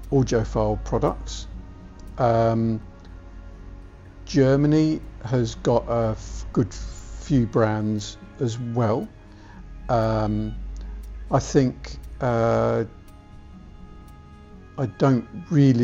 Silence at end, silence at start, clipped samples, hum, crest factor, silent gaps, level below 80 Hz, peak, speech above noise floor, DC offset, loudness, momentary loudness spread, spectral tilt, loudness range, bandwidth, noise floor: 0 s; 0 s; under 0.1%; none; 18 dB; none; -38 dBFS; -6 dBFS; 22 dB; under 0.1%; -23 LUFS; 24 LU; -7.5 dB/octave; 4 LU; 8 kHz; -44 dBFS